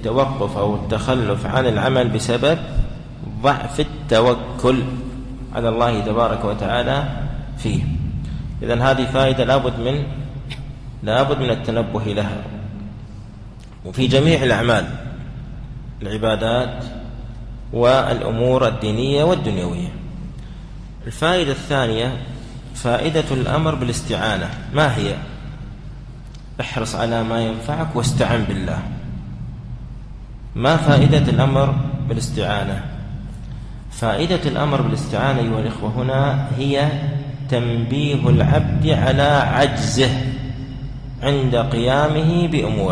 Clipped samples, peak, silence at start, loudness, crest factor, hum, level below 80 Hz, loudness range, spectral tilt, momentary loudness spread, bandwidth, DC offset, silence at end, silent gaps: under 0.1%; -2 dBFS; 0 s; -19 LUFS; 16 dB; none; -34 dBFS; 5 LU; -6 dB/octave; 18 LU; 11 kHz; under 0.1%; 0 s; none